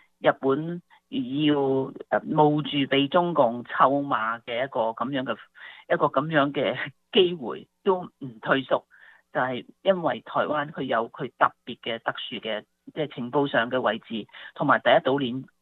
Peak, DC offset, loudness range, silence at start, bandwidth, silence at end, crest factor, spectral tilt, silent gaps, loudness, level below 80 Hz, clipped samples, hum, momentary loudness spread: -4 dBFS; under 0.1%; 4 LU; 0.2 s; 4.3 kHz; 0.15 s; 22 dB; -8.5 dB/octave; none; -25 LUFS; -70 dBFS; under 0.1%; none; 13 LU